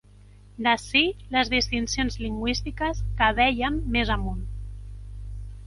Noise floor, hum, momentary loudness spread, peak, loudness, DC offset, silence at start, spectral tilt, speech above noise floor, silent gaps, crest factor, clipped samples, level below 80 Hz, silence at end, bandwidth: -50 dBFS; 50 Hz at -35 dBFS; 19 LU; -6 dBFS; -24 LUFS; under 0.1%; 0.25 s; -4 dB/octave; 25 dB; none; 20 dB; under 0.1%; -34 dBFS; 0 s; 11.5 kHz